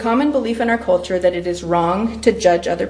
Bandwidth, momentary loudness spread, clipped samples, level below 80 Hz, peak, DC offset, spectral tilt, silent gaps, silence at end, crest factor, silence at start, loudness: 10.5 kHz; 3 LU; under 0.1%; -42 dBFS; 0 dBFS; under 0.1%; -5.5 dB/octave; none; 0 s; 16 dB; 0 s; -17 LUFS